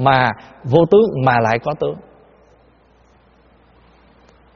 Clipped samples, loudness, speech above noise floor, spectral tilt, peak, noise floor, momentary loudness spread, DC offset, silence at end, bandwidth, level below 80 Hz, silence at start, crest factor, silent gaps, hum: under 0.1%; -16 LUFS; 37 dB; -5 dB/octave; 0 dBFS; -52 dBFS; 13 LU; under 0.1%; 2.55 s; 6.6 kHz; -50 dBFS; 0 s; 18 dB; none; none